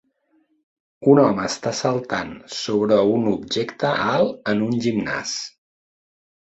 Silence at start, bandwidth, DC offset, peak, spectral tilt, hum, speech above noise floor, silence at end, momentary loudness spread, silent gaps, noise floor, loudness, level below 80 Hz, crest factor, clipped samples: 1 s; 8.2 kHz; under 0.1%; -2 dBFS; -5 dB/octave; none; 44 dB; 1 s; 11 LU; none; -64 dBFS; -21 LUFS; -58 dBFS; 20 dB; under 0.1%